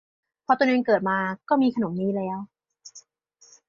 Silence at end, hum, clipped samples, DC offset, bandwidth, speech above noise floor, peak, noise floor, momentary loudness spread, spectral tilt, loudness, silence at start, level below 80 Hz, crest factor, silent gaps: 0.7 s; none; under 0.1%; under 0.1%; 7.4 kHz; 36 dB; -8 dBFS; -59 dBFS; 24 LU; -6.5 dB/octave; -24 LUFS; 0.5 s; -68 dBFS; 18 dB; none